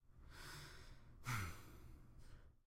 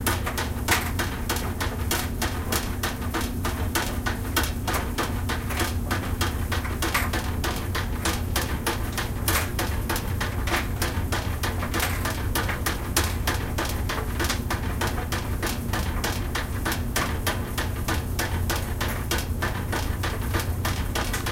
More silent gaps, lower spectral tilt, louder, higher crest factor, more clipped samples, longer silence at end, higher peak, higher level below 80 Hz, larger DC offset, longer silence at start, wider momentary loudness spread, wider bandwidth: neither; about the same, -4 dB/octave vs -4 dB/octave; second, -52 LUFS vs -27 LUFS; about the same, 20 dB vs 18 dB; neither; about the same, 0.05 s vs 0 s; second, -32 dBFS vs -8 dBFS; second, -62 dBFS vs -32 dBFS; neither; about the same, 0 s vs 0 s; first, 18 LU vs 3 LU; about the same, 16.5 kHz vs 17 kHz